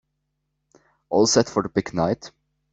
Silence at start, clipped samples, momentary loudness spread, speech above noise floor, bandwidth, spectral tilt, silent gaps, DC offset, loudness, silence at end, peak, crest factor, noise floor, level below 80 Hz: 1.1 s; under 0.1%; 7 LU; 55 dB; 8.2 kHz; -4 dB/octave; none; under 0.1%; -22 LUFS; 0.45 s; -4 dBFS; 20 dB; -76 dBFS; -56 dBFS